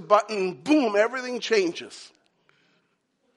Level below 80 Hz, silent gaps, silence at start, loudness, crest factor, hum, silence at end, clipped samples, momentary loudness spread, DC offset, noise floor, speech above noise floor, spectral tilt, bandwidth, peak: -84 dBFS; none; 0 s; -24 LUFS; 22 dB; none; 1.3 s; under 0.1%; 17 LU; under 0.1%; -71 dBFS; 48 dB; -4 dB/octave; 11.5 kHz; -4 dBFS